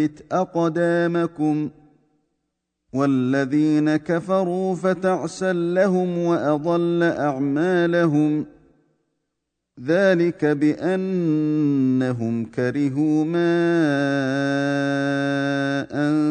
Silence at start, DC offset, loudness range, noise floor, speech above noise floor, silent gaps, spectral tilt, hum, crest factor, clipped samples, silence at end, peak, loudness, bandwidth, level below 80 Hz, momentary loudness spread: 0 s; under 0.1%; 2 LU; -79 dBFS; 59 dB; none; -7.5 dB/octave; none; 14 dB; under 0.1%; 0 s; -8 dBFS; -21 LUFS; 9.4 kHz; -64 dBFS; 5 LU